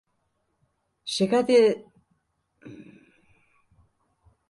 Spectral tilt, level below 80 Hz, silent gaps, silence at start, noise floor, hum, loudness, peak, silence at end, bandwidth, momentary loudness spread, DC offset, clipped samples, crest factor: -5 dB/octave; -72 dBFS; none; 1.05 s; -74 dBFS; none; -22 LUFS; -10 dBFS; 1.7 s; 11.5 kHz; 26 LU; under 0.1%; under 0.1%; 20 dB